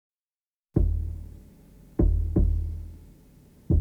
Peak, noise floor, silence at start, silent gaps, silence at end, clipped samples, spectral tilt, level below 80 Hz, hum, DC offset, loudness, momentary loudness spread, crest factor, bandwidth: -10 dBFS; under -90 dBFS; 0.75 s; none; 0 s; under 0.1%; -11.5 dB/octave; -30 dBFS; none; under 0.1%; -28 LUFS; 16 LU; 16 dB; 1.9 kHz